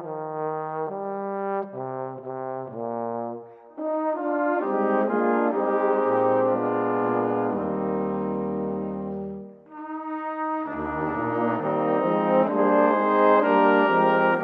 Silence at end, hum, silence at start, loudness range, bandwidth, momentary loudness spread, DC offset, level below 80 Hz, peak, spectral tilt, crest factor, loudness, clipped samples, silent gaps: 0 s; none; 0 s; 9 LU; 5 kHz; 13 LU; under 0.1%; -60 dBFS; -6 dBFS; -9.5 dB/octave; 18 dB; -24 LUFS; under 0.1%; none